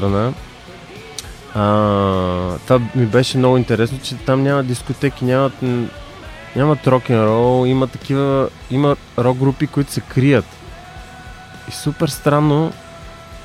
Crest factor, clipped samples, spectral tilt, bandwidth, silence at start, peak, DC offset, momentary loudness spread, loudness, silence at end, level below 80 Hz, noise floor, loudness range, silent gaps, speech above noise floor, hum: 16 dB; under 0.1%; -7 dB/octave; 15 kHz; 0 s; -2 dBFS; under 0.1%; 21 LU; -17 LUFS; 0 s; -40 dBFS; -36 dBFS; 3 LU; none; 20 dB; none